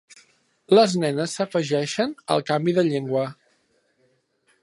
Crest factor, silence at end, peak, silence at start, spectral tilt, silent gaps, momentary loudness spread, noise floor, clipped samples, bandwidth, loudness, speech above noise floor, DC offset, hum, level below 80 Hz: 20 dB; 1.3 s; -4 dBFS; 0.7 s; -5.5 dB/octave; none; 9 LU; -66 dBFS; under 0.1%; 11.5 kHz; -22 LUFS; 45 dB; under 0.1%; none; -74 dBFS